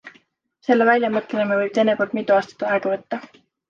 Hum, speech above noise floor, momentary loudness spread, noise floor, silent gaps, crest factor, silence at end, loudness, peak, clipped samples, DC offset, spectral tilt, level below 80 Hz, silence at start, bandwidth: none; 40 dB; 11 LU; -60 dBFS; none; 18 dB; 0.45 s; -20 LUFS; -4 dBFS; under 0.1%; under 0.1%; -6 dB/octave; -72 dBFS; 0.05 s; 7.4 kHz